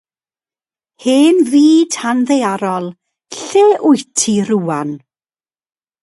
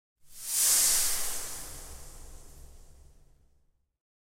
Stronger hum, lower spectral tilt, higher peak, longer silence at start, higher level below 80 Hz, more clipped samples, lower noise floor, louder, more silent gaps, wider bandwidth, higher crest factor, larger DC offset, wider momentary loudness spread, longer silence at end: neither; first, -4.5 dB/octave vs 1.5 dB/octave; first, 0 dBFS vs -12 dBFS; first, 1.05 s vs 0.25 s; second, -64 dBFS vs -50 dBFS; neither; first, under -90 dBFS vs -69 dBFS; first, -13 LUFS vs -25 LUFS; neither; second, 11.5 kHz vs 16 kHz; second, 14 dB vs 22 dB; neither; second, 15 LU vs 24 LU; second, 1.05 s vs 1.35 s